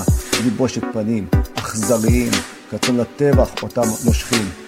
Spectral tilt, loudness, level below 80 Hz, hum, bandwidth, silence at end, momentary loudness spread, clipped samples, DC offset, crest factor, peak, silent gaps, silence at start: -5 dB/octave; -18 LUFS; -26 dBFS; none; 16.5 kHz; 0 s; 6 LU; under 0.1%; under 0.1%; 16 dB; -2 dBFS; none; 0 s